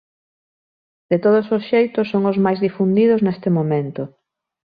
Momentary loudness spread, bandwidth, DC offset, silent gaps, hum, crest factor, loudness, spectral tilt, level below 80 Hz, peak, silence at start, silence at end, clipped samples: 7 LU; 5 kHz; under 0.1%; none; none; 14 dB; -18 LUFS; -10.5 dB/octave; -62 dBFS; -4 dBFS; 1.1 s; 0.6 s; under 0.1%